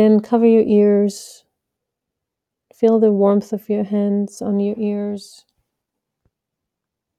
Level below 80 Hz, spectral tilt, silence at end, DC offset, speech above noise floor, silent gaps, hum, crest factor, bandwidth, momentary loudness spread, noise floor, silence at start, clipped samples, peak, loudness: -70 dBFS; -8 dB/octave; 2 s; under 0.1%; 66 dB; none; none; 16 dB; 13 kHz; 10 LU; -82 dBFS; 0 s; under 0.1%; -2 dBFS; -17 LUFS